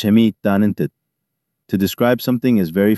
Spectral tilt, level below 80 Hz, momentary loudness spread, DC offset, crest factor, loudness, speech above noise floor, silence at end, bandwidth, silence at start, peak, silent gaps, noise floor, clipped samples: -7 dB/octave; -56 dBFS; 10 LU; under 0.1%; 14 dB; -17 LUFS; 61 dB; 0 s; 13.5 kHz; 0 s; -2 dBFS; none; -76 dBFS; under 0.1%